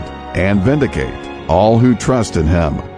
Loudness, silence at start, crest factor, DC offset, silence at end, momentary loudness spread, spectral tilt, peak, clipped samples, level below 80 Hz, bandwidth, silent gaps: -14 LUFS; 0 s; 14 dB; under 0.1%; 0 s; 11 LU; -7 dB/octave; 0 dBFS; under 0.1%; -28 dBFS; 10.5 kHz; none